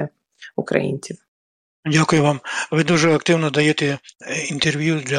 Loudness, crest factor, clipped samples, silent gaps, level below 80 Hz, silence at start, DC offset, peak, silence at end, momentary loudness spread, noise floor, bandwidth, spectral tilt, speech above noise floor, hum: -19 LUFS; 18 dB; under 0.1%; 1.28-1.83 s; -58 dBFS; 0 s; under 0.1%; -2 dBFS; 0 s; 15 LU; under -90 dBFS; 10.5 kHz; -5 dB/octave; over 71 dB; none